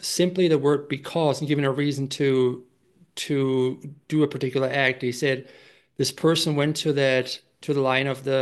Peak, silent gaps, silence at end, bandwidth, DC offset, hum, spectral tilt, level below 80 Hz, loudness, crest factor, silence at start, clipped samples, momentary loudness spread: -6 dBFS; none; 0 s; 12.5 kHz; under 0.1%; none; -5 dB/octave; -70 dBFS; -24 LUFS; 18 dB; 0 s; under 0.1%; 8 LU